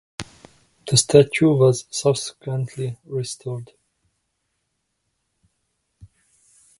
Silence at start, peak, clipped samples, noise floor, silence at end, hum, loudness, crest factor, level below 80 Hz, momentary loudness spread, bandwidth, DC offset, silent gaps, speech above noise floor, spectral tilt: 0.2 s; 0 dBFS; under 0.1%; -75 dBFS; 0.75 s; none; -20 LUFS; 22 dB; -56 dBFS; 21 LU; 11.5 kHz; under 0.1%; none; 55 dB; -5 dB/octave